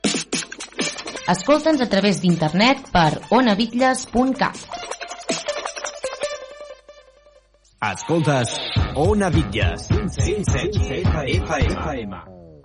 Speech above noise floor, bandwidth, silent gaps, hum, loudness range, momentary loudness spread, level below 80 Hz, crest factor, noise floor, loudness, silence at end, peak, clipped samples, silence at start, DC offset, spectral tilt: 36 dB; 11 kHz; none; none; 9 LU; 13 LU; -34 dBFS; 16 dB; -55 dBFS; -21 LUFS; 0.05 s; -6 dBFS; under 0.1%; 0.05 s; under 0.1%; -5 dB/octave